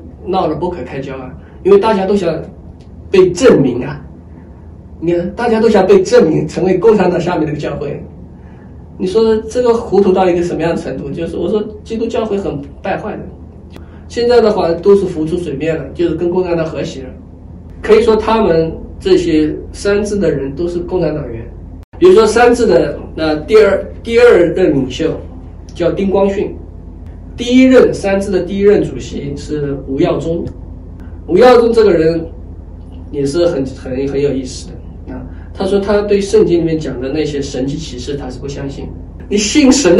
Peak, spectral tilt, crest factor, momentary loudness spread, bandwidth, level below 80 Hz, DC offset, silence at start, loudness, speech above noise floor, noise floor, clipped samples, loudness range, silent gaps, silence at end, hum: 0 dBFS; -6 dB/octave; 12 dB; 20 LU; 12 kHz; -34 dBFS; under 0.1%; 0 s; -13 LUFS; 22 dB; -34 dBFS; 0.2%; 5 LU; 21.84-21.92 s; 0 s; none